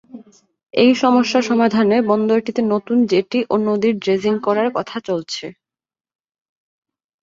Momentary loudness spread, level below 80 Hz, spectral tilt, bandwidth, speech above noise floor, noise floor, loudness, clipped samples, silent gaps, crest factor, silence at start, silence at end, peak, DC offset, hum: 9 LU; -62 dBFS; -5.5 dB/octave; 7.6 kHz; 25 dB; -41 dBFS; -17 LUFS; under 0.1%; none; 16 dB; 0.15 s; 1.7 s; -2 dBFS; under 0.1%; none